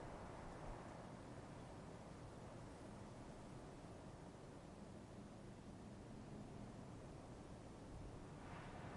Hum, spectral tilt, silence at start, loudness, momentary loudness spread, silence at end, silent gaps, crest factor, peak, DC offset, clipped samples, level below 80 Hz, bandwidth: none; -6 dB/octave; 0 s; -57 LUFS; 3 LU; 0 s; none; 14 dB; -42 dBFS; under 0.1%; under 0.1%; -66 dBFS; 11 kHz